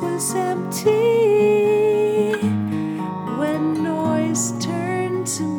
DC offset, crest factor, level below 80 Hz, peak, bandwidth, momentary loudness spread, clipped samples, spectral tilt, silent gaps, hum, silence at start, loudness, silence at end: under 0.1%; 14 dB; -68 dBFS; -6 dBFS; 18.5 kHz; 8 LU; under 0.1%; -5 dB/octave; none; none; 0 s; -20 LUFS; 0 s